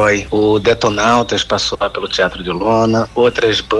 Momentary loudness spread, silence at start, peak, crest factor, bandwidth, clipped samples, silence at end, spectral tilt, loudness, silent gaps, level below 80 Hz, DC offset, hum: 4 LU; 0 s; -2 dBFS; 12 dB; 11.5 kHz; under 0.1%; 0 s; -4.5 dB/octave; -14 LUFS; none; -38 dBFS; under 0.1%; none